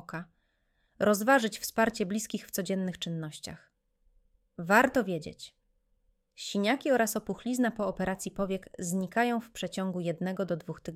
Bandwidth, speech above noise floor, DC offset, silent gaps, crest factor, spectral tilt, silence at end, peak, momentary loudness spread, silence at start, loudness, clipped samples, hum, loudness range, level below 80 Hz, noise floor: 16.5 kHz; 44 dB; under 0.1%; none; 22 dB; -4.5 dB/octave; 0 s; -10 dBFS; 17 LU; 0.1 s; -30 LUFS; under 0.1%; none; 2 LU; -62 dBFS; -74 dBFS